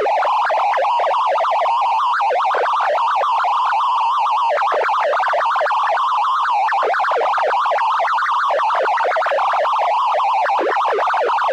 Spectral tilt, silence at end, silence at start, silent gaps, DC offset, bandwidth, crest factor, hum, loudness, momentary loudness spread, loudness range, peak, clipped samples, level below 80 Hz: 0.5 dB/octave; 0 s; 0 s; none; under 0.1%; 11 kHz; 6 dB; none; -17 LUFS; 0 LU; 0 LU; -10 dBFS; under 0.1%; -88 dBFS